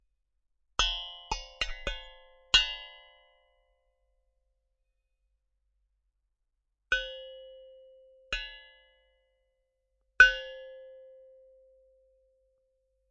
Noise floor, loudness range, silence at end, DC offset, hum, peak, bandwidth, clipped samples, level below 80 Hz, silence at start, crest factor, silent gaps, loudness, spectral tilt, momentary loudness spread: -81 dBFS; 11 LU; 2.2 s; under 0.1%; 50 Hz at -80 dBFS; -4 dBFS; 7.6 kHz; under 0.1%; -50 dBFS; 0.8 s; 32 dB; none; -27 LUFS; 2.5 dB/octave; 27 LU